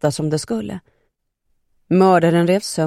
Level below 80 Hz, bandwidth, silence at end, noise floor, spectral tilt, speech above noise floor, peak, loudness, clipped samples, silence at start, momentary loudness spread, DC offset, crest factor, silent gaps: -56 dBFS; 14 kHz; 0 s; -69 dBFS; -6 dB/octave; 52 dB; -2 dBFS; -17 LUFS; under 0.1%; 0.05 s; 15 LU; under 0.1%; 16 dB; none